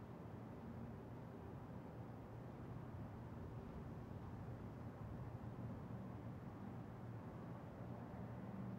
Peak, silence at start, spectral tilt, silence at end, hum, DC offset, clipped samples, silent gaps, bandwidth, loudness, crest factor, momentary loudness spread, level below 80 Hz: -40 dBFS; 0 s; -9 dB/octave; 0 s; none; under 0.1%; under 0.1%; none; 16 kHz; -53 LUFS; 12 dB; 3 LU; -66 dBFS